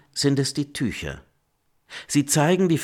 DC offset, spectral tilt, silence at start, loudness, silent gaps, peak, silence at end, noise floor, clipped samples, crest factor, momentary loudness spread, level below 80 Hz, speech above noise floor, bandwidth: under 0.1%; -4.5 dB/octave; 0.15 s; -23 LUFS; none; -6 dBFS; 0 s; -68 dBFS; under 0.1%; 18 dB; 20 LU; -52 dBFS; 46 dB; 18 kHz